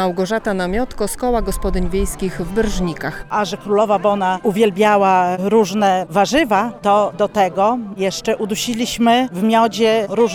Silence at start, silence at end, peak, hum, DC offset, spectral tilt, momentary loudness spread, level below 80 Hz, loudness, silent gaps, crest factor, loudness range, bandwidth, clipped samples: 0 s; 0 s; -2 dBFS; none; under 0.1%; -5 dB/octave; 7 LU; -32 dBFS; -17 LUFS; none; 14 dB; 5 LU; 18.5 kHz; under 0.1%